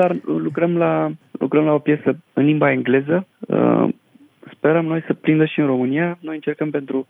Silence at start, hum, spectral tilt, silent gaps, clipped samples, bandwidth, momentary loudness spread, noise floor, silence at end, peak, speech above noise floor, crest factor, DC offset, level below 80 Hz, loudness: 0 s; none; -10 dB/octave; none; under 0.1%; 3.8 kHz; 7 LU; -48 dBFS; 0.05 s; -4 dBFS; 30 dB; 14 dB; under 0.1%; -70 dBFS; -19 LUFS